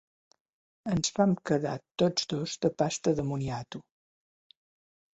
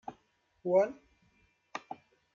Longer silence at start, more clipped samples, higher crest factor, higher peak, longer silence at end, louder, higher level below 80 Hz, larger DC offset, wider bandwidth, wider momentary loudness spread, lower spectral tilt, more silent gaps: first, 0.85 s vs 0.1 s; neither; about the same, 20 dB vs 20 dB; first, -10 dBFS vs -16 dBFS; first, 1.3 s vs 0.4 s; about the same, -30 LUFS vs -32 LUFS; first, -62 dBFS vs -78 dBFS; neither; first, 8.2 kHz vs 7.2 kHz; second, 12 LU vs 21 LU; second, -5 dB/octave vs -6.5 dB/octave; first, 1.91-1.95 s vs none